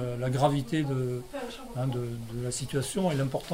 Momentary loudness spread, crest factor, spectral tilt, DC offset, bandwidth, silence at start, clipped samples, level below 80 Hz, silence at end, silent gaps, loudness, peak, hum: 10 LU; 18 dB; -6 dB/octave; under 0.1%; 16 kHz; 0 s; under 0.1%; -52 dBFS; 0 s; none; -31 LUFS; -12 dBFS; none